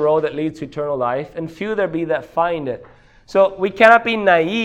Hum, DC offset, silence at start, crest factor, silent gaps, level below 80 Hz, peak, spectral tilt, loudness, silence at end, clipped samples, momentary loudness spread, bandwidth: none; under 0.1%; 0 s; 18 dB; none; -54 dBFS; 0 dBFS; -6 dB/octave; -17 LUFS; 0 s; under 0.1%; 15 LU; 9.8 kHz